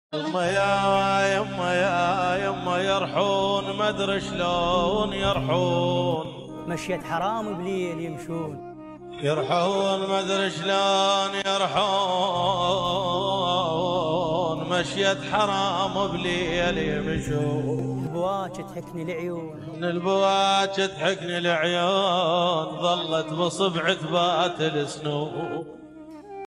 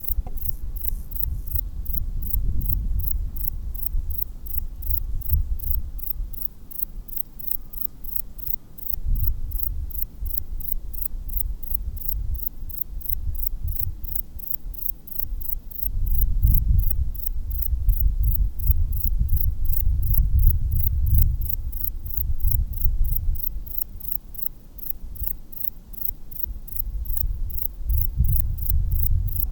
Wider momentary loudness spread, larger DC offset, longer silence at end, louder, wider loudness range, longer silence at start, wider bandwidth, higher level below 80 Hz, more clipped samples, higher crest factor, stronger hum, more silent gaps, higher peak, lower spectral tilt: first, 10 LU vs 6 LU; neither; about the same, 0.05 s vs 0 s; about the same, -24 LUFS vs -26 LUFS; about the same, 4 LU vs 4 LU; about the same, 0.1 s vs 0 s; second, 12.5 kHz vs over 20 kHz; second, -50 dBFS vs -24 dBFS; neither; about the same, 18 dB vs 22 dB; neither; neither; second, -8 dBFS vs 0 dBFS; second, -4.5 dB/octave vs -7 dB/octave